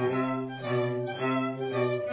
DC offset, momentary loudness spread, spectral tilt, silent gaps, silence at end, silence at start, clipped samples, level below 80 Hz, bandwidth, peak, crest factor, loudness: under 0.1%; 2 LU; -5.5 dB/octave; none; 0 s; 0 s; under 0.1%; -72 dBFS; 4 kHz; -16 dBFS; 14 dB; -30 LUFS